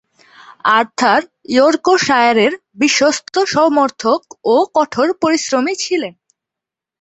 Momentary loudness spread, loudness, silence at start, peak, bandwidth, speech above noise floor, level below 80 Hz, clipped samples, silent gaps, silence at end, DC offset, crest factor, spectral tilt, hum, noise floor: 6 LU; -14 LUFS; 0.5 s; 0 dBFS; 8.2 kHz; 71 dB; -60 dBFS; under 0.1%; none; 0.9 s; under 0.1%; 14 dB; -3 dB/octave; none; -85 dBFS